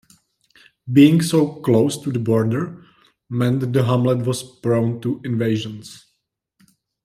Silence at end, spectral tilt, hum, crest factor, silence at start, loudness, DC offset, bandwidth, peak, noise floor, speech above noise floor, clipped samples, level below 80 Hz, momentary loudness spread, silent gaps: 1.1 s; -7 dB/octave; none; 18 dB; 0.85 s; -19 LUFS; under 0.1%; 14.5 kHz; -2 dBFS; -73 dBFS; 55 dB; under 0.1%; -60 dBFS; 15 LU; none